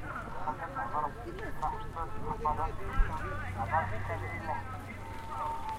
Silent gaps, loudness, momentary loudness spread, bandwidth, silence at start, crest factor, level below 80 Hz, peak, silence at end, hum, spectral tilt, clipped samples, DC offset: none; -37 LUFS; 9 LU; 15 kHz; 0 s; 20 dB; -40 dBFS; -14 dBFS; 0 s; none; -6.5 dB/octave; under 0.1%; under 0.1%